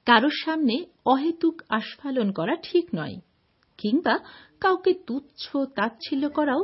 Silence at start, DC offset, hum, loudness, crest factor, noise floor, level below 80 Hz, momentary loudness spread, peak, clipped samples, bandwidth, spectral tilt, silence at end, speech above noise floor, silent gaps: 0.05 s; under 0.1%; none; -25 LUFS; 22 dB; -66 dBFS; -68 dBFS; 9 LU; -2 dBFS; under 0.1%; 5.8 kHz; -8.5 dB/octave; 0 s; 42 dB; none